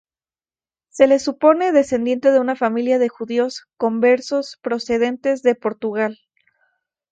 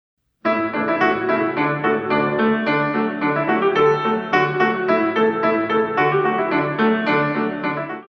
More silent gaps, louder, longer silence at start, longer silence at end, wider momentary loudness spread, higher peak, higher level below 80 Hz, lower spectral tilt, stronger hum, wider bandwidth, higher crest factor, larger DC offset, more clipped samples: neither; about the same, -18 LUFS vs -19 LUFS; first, 0.95 s vs 0.45 s; first, 1 s vs 0.05 s; first, 9 LU vs 4 LU; first, 0 dBFS vs -4 dBFS; about the same, -62 dBFS vs -60 dBFS; second, -4.5 dB/octave vs -7.5 dB/octave; neither; first, 9 kHz vs 6.4 kHz; about the same, 18 dB vs 16 dB; neither; neither